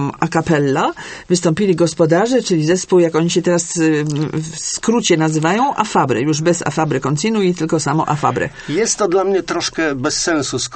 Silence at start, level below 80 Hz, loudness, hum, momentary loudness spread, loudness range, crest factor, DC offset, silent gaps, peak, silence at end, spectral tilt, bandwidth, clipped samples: 0 s; -48 dBFS; -16 LUFS; none; 5 LU; 2 LU; 16 dB; under 0.1%; none; 0 dBFS; 0 s; -4.5 dB/octave; 8.8 kHz; under 0.1%